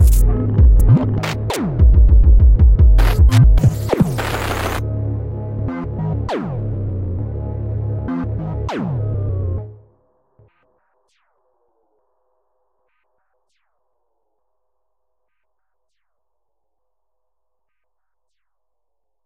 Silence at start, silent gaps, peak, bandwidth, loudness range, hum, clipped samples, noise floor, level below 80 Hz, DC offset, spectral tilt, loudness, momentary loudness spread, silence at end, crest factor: 0 s; none; -2 dBFS; 16 kHz; 13 LU; none; under 0.1%; -80 dBFS; -18 dBFS; under 0.1%; -7 dB/octave; -17 LUFS; 12 LU; 9.55 s; 14 dB